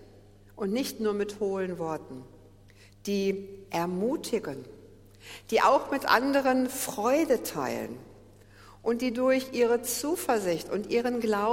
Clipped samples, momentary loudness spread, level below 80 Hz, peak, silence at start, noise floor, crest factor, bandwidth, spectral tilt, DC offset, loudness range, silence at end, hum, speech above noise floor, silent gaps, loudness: under 0.1%; 15 LU; -60 dBFS; -8 dBFS; 0 s; -55 dBFS; 22 dB; 16.5 kHz; -4 dB/octave; under 0.1%; 7 LU; 0 s; none; 27 dB; none; -28 LUFS